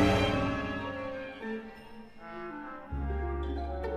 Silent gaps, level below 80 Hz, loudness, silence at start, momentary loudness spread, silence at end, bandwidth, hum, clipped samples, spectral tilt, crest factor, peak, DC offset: none; -40 dBFS; -34 LUFS; 0 s; 18 LU; 0 s; 15 kHz; none; under 0.1%; -6.5 dB/octave; 20 dB; -14 dBFS; under 0.1%